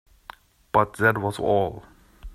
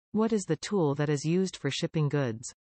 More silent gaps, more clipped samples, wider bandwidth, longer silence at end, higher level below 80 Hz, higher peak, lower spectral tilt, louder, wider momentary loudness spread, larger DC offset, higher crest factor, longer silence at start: neither; neither; first, 13.5 kHz vs 8.8 kHz; second, 0 s vs 0.25 s; first, -48 dBFS vs -66 dBFS; first, -4 dBFS vs -16 dBFS; about the same, -6.5 dB/octave vs -6 dB/octave; first, -23 LUFS vs -29 LUFS; first, 8 LU vs 4 LU; neither; first, 22 dB vs 14 dB; first, 0.75 s vs 0.15 s